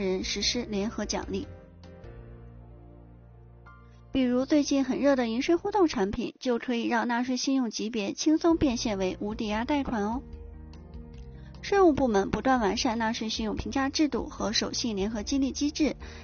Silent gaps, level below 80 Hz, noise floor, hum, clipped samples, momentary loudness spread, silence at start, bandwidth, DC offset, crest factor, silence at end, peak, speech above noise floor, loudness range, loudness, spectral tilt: none; -46 dBFS; -51 dBFS; none; under 0.1%; 21 LU; 0 s; 7 kHz; under 0.1%; 18 dB; 0 s; -10 dBFS; 24 dB; 7 LU; -28 LUFS; -3.5 dB/octave